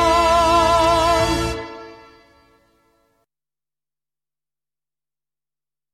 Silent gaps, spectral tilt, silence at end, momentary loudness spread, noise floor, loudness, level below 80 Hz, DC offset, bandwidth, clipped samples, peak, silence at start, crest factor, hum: none; -4 dB/octave; 4 s; 17 LU; under -90 dBFS; -16 LUFS; -36 dBFS; under 0.1%; 15 kHz; under 0.1%; -6 dBFS; 0 s; 16 dB; none